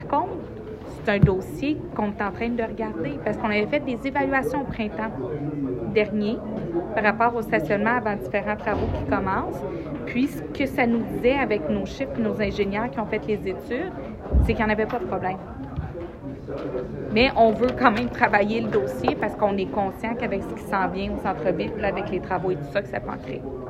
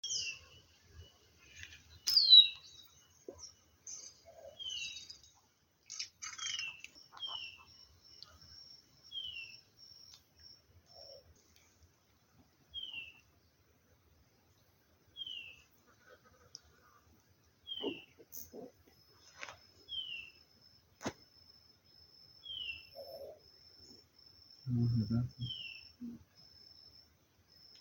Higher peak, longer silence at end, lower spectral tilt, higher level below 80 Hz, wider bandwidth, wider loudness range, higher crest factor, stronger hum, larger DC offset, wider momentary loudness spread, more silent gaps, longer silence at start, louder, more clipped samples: first, -2 dBFS vs -12 dBFS; second, 0 s vs 1.65 s; first, -7.5 dB/octave vs -2.5 dB/octave; first, -38 dBFS vs -70 dBFS; second, 14.5 kHz vs 17 kHz; second, 4 LU vs 23 LU; second, 22 dB vs 30 dB; neither; neither; second, 11 LU vs 22 LU; neither; about the same, 0 s vs 0.05 s; first, -25 LUFS vs -32 LUFS; neither